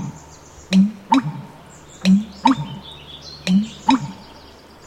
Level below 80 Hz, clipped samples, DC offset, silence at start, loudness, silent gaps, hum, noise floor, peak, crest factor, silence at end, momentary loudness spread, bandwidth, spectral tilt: -52 dBFS; under 0.1%; under 0.1%; 0 s; -19 LUFS; none; none; -43 dBFS; -2 dBFS; 20 dB; 0.65 s; 19 LU; 9.6 kHz; -6 dB/octave